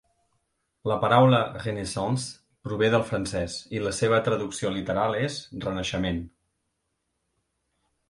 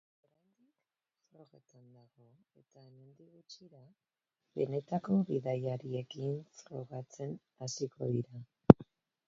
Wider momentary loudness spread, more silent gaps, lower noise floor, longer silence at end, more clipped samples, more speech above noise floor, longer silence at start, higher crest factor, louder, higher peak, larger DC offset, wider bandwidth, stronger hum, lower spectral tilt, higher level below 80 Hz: second, 13 LU vs 23 LU; neither; second, -78 dBFS vs -90 dBFS; first, 1.8 s vs 0.45 s; neither; about the same, 53 dB vs 50 dB; second, 0.85 s vs 3.5 s; second, 22 dB vs 34 dB; first, -26 LUFS vs -33 LUFS; second, -4 dBFS vs 0 dBFS; neither; first, 11.5 kHz vs 7.4 kHz; neither; second, -5.5 dB/octave vs -8.5 dB/octave; first, -50 dBFS vs -60 dBFS